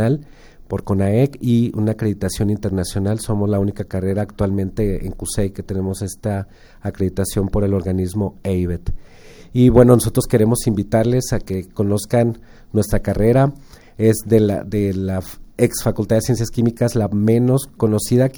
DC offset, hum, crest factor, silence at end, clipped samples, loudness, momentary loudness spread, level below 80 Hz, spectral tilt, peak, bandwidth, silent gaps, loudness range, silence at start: under 0.1%; none; 18 dB; 0 s; under 0.1%; -19 LUFS; 9 LU; -34 dBFS; -7 dB/octave; 0 dBFS; over 20 kHz; none; 6 LU; 0 s